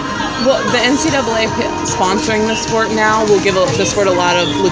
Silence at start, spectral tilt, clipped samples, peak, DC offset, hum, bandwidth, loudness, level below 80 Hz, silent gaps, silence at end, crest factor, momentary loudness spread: 0 s; -3.5 dB/octave; under 0.1%; 0 dBFS; under 0.1%; none; 8 kHz; -13 LUFS; -38 dBFS; none; 0 s; 14 dB; 4 LU